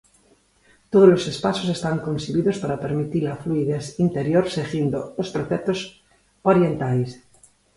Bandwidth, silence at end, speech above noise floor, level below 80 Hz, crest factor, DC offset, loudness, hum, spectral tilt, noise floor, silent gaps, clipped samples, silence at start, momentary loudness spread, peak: 11.5 kHz; 0.6 s; 38 dB; -54 dBFS; 20 dB; under 0.1%; -22 LUFS; none; -7 dB/octave; -59 dBFS; none; under 0.1%; 0.9 s; 11 LU; -2 dBFS